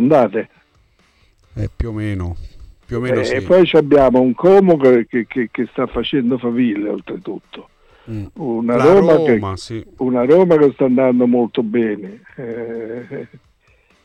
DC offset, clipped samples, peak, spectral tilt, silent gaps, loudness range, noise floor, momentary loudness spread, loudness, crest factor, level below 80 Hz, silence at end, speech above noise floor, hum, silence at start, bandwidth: under 0.1%; under 0.1%; -4 dBFS; -7.5 dB/octave; none; 7 LU; -56 dBFS; 18 LU; -15 LUFS; 12 dB; -40 dBFS; 0.8 s; 41 dB; none; 0 s; 9.6 kHz